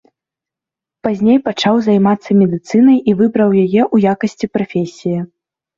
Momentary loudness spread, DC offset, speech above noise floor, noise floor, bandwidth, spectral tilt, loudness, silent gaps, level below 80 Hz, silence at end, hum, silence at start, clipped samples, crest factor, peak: 10 LU; under 0.1%; 73 dB; -86 dBFS; 7.4 kHz; -7.5 dB/octave; -14 LUFS; none; -54 dBFS; 0.5 s; none; 1.05 s; under 0.1%; 12 dB; -2 dBFS